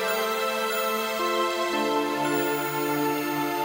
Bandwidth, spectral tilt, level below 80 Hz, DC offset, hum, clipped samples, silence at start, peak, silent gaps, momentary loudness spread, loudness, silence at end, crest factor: 16.5 kHz; -3.5 dB/octave; -70 dBFS; under 0.1%; none; under 0.1%; 0 s; -14 dBFS; none; 1 LU; -26 LUFS; 0 s; 12 dB